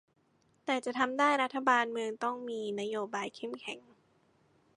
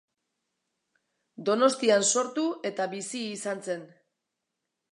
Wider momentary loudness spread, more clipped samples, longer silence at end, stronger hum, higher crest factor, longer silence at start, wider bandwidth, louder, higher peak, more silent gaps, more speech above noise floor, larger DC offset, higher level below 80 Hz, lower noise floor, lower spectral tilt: about the same, 14 LU vs 12 LU; neither; about the same, 1 s vs 1.05 s; neither; about the same, 22 dB vs 22 dB; second, 0.65 s vs 1.4 s; about the same, 11 kHz vs 11.5 kHz; second, -32 LUFS vs -27 LUFS; second, -12 dBFS vs -8 dBFS; neither; second, 38 dB vs 57 dB; neither; about the same, -84 dBFS vs -84 dBFS; second, -71 dBFS vs -84 dBFS; about the same, -3.5 dB/octave vs -2.5 dB/octave